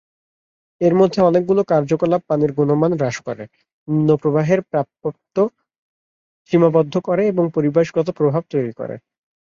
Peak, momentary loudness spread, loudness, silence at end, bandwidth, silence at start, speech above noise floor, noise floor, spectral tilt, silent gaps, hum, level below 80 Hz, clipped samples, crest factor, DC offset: -2 dBFS; 12 LU; -18 LUFS; 0.6 s; 7.4 kHz; 0.8 s; over 73 dB; under -90 dBFS; -8 dB/octave; 3.73-3.86 s, 5.78-6.45 s; none; -58 dBFS; under 0.1%; 16 dB; under 0.1%